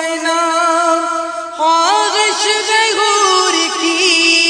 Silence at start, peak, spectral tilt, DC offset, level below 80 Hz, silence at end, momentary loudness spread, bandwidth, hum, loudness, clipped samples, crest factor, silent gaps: 0 s; 0 dBFS; 1.5 dB/octave; under 0.1%; -60 dBFS; 0 s; 5 LU; 10 kHz; none; -12 LUFS; under 0.1%; 14 dB; none